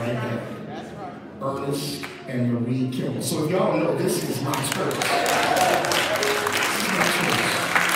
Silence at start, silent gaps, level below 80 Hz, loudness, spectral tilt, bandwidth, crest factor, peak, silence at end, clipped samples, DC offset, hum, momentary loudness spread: 0 s; none; -60 dBFS; -23 LUFS; -3.5 dB/octave; 16.5 kHz; 20 dB; -4 dBFS; 0 s; under 0.1%; under 0.1%; none; 12 LU